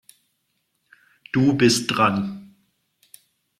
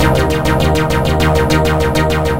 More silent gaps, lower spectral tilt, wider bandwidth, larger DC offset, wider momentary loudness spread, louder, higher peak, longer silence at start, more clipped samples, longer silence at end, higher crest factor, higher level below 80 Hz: neither; second, -4.5 dB/octave vs -6 dB/octave; second, 14.5 kHz vs 17 kHz; second, under 0.1% vs 3%; first, 13 LU vs 2 LU; second, -20 LUFS vs -13 LUFS; second, -4 dBFS vs 0 dBFS; first, 1.35 s vs 0 s; neither; first, 1.15 s vs 0 s; first, 20 dB vs 12 dB; second, -60 dBFS vs -22 dBFS